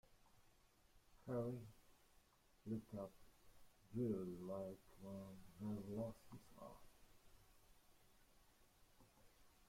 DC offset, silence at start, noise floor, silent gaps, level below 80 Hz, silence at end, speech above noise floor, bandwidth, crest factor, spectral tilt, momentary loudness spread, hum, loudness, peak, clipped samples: under 0.1%; 0.1 s; -74 dBFS; none; -74 dBFS; 0 s; 24 dB; 16.5 kHz; 20 dB; -8 dB/octave; 16 LU; none; -51 LUFS; -34 dBFS; under 0.1%